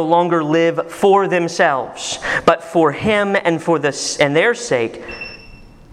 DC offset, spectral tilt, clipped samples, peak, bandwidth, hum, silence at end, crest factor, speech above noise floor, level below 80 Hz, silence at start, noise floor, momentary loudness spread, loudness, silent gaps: under 0.1%; -4.5 dB/octave; under 0.1%; 0 dBFS; 13.5 kHz; none; 0.3 s; 16 dB; 24 dB; -48 dBFS; 0 s; -40 dBFS; 10 LU; -16 LUFS; none